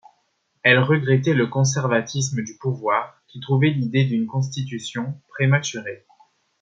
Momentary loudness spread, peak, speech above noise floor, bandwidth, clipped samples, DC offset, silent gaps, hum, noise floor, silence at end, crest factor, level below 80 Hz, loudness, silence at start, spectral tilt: 13 LU; -2 dBFS; 48 dB; 7.8 kHz; under 0.1%; under 0.1%; none; none; -69 dBFS; 0.65 s; 20 dB; -64 dBFS; -21 LUFS; 0.65 s; -5.5 dB/octave